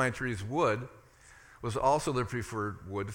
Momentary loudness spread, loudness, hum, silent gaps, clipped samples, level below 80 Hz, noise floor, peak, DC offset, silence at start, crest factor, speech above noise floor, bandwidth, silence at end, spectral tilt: 10 LU; -32 LUFS; none; none; under 0.1%; -56 dBFS; -57 dBFS; -14 dBFS; under 0.1%; 0 s; 18 dB; 25 dB; 17.5 kHz; 0 s; -5.5 dB/octave